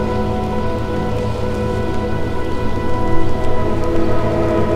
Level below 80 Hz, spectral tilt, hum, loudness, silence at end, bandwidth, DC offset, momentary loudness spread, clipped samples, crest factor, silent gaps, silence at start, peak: -24 dBFS; -7.5 dB/octave; none; -20 LUFS; 0 s; 8.2 kHz; under 0.1%; 4 LU; under 0.1%; 14 dB; none; 0 s; -2 dBFS